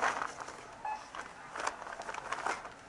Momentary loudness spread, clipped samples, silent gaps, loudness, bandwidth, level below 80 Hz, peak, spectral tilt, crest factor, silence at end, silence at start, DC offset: 8 LU; under 0.1%; none; -40 LUFS; 11.5 kHz; -68 dBFS; -16 dBFS; -1.5 dB/octave; 24 dB; 0 s; 0 s; under 0.1%